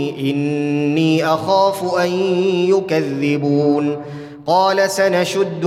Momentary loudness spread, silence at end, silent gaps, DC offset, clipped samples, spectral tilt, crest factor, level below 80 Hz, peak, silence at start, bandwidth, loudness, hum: 5 LU; 0 s; none; under 0.1%; under 0.1%; -5.5 dB/octave; 14 dB; -62 dBFS; -2 dBFS; 0 s; 15.5 kHz; -16 LUFS; none